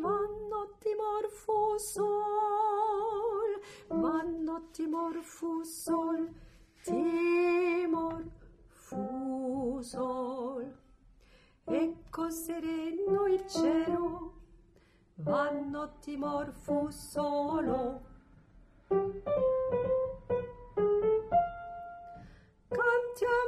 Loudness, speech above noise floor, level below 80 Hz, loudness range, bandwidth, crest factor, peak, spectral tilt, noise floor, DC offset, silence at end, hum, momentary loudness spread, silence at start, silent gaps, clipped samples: -33 LUFS; 31 dB; -58 dBFS; 5 LU; 15 kHz; 16 dB; -16 dBFS; -5.5 dB/octave; -64 dBFS; under 0.1%; 0 s; none; 11 LU; 0 s; none; under 0.1%